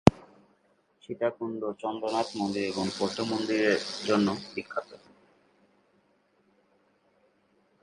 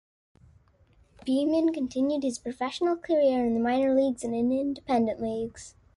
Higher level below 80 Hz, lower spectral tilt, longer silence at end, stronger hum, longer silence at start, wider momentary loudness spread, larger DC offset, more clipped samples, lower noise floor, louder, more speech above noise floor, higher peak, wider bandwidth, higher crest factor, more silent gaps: first, -54 dBFS vs -60 dBFS; about the same, -5.5 dB/octave vs -5.5 dB/octave; first, 2.85 s vs 0.3 s; neither; second, 0.05 s vs 1.25 s; about the same, 10 LU vs 9 LU; neither; neither; first, -68 dBFS vs -61 dBFS; second, -30 LUFS vs -27 LUFS; about the same, 38 dB vs 35 dB; first, 0 dBFS vs -14 dBFS; about the same, 11.5 kHz vs 11.5 kHz; first, 30 dB vs 14 dB; neither